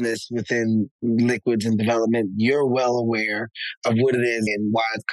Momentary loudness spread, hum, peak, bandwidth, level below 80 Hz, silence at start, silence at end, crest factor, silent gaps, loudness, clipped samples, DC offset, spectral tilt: 5 LU; none; -10 dBFS; 12.5 kHz; -66 dBFS; 0 s; 0 s; 12 dB; 0.91-0.99 s, 3.77-3.82 s; -22 LUFS; under 0.1%; under 0.1%; -6 dB/octave